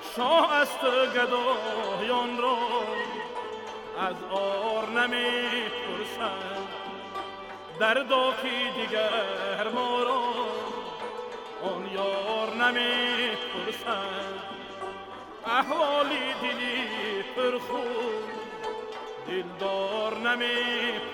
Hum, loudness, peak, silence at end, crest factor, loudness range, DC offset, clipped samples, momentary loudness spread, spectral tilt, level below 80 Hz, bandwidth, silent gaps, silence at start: none; -28 LUFS; -10 dBFS; 0 s; 18 dB; 3 LU; under 0.1%; under 0.1%; 13 LU; -3 dB/octave; -68 dBFS; 17.5 kHz; none; 0 s